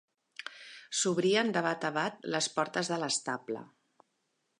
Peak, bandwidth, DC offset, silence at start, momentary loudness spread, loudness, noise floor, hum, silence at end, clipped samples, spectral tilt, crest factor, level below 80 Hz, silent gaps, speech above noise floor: -12 dBFS; 11.5 kHz; under 0.1%; 0.4 s; 17 LU; -31 LUFS; -79 dBFS; none; 0.95 s; under 0.1%; -3 dB/octave; 22 dB; -84 dBFS; none; 48 dB